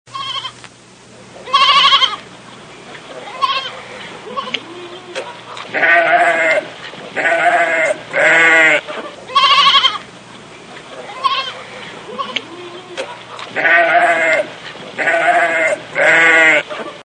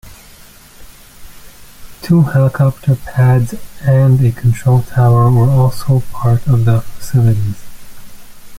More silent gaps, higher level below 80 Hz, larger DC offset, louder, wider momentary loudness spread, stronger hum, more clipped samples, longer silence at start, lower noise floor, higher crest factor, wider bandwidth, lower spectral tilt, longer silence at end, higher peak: neither; second, -62 dBFS vs -36 dBFS; neither; about the same, -12 LUFS vs -13 LUFS; first, 22 LU vs 7 LU; neither; neither; about the same, 0.1 s vs 0.05 s; about the same, -41 dBFS vs -39 dBFS; about the same, 16 dB vs 12 dB; second, 10 kHz vs 16 kHz; second, -1.5 dB/octave vs -8 dB/octave; about the same, 0.1 s vs 0 s; about the same, 0 dBFS vs -2 dBFS